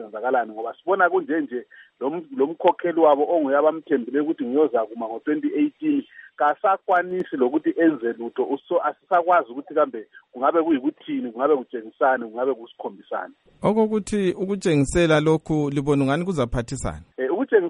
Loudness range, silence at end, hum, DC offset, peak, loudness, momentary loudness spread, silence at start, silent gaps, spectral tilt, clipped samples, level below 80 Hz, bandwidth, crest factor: 3 LU; 0 s; none; under 0.1%; -4 dBFS; -22 LUFS; 11 LU; 0 s; none; -6.5 dB/octave; under 0.1%; -46 dBFS; 11 kHz; 18 dB